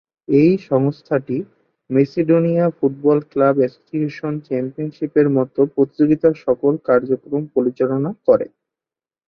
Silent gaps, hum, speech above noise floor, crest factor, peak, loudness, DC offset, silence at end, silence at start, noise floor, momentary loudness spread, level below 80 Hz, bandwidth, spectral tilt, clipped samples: none; none; over 73 dB; 16 dB; -2 dBFS; -18 LUFS; under 0.1%; 0.8 s; 0.3 s; under -90 dBFS; 9 LU; -60 dBFS; 6.2 kHz; -10.5 dB/octave; under 0.1%